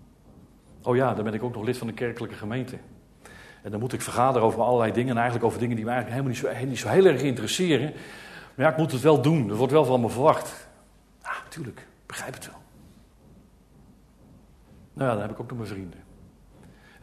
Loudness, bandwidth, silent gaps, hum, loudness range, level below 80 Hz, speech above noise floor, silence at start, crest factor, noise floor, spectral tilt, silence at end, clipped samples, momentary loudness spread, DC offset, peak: -25 LUFS; 13.5 kHz; none; none; 17 LU; -58 dBFS; 32 dB; 0.8 s; 22 dB; -56 dBFS; -6 dB/octave; 1 s; under 0.1%; 20 LU; under 0.1%; -6 dBFS